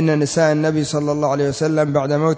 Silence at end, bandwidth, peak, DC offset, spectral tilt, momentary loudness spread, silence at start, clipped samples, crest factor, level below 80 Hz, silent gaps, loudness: 0 s; 8 kHz; -4 dBFS; under 0.1%; -6 dB/octave; 3 LU; 0 s; under 0.1%; 12 dB; -52 dBFS; none; -18 LUFS